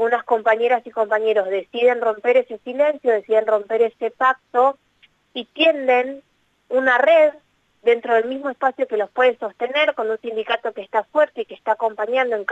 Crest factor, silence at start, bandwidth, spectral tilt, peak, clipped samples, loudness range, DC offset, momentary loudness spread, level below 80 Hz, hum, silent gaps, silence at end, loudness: 14 dB; 0 s; 7.8 kHz; -4 dB/octave; -6 dBFS; under 0.1%; 2 LU; under 0.1%; 8 LU; -72 dBFS; none; none; 0 s; -19 LUFS